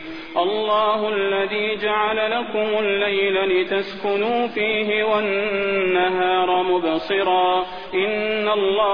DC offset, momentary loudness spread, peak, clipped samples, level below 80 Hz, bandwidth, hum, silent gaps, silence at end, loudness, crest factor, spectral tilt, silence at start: 0.6%; 4 LU; -6 dBFS; under 0.1%; -56 dBFS; 5.2 kHz; none; none; 0 s; -20 LUFS; 14 dB; -6.5 dB/octave; 0 s